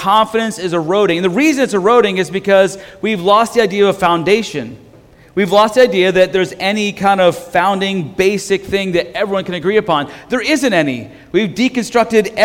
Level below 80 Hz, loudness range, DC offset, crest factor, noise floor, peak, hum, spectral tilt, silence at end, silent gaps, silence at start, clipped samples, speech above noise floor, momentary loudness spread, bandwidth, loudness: -48 dBFS; 3 LU; under 0.1%; 14 dB; -43 dBFS; 0 dBFS; none; -4.5 dB/octave; 0 s; none; 0 s; under 0.1%; 29 dB; 7 LU; 17 kHz; -14 LUFS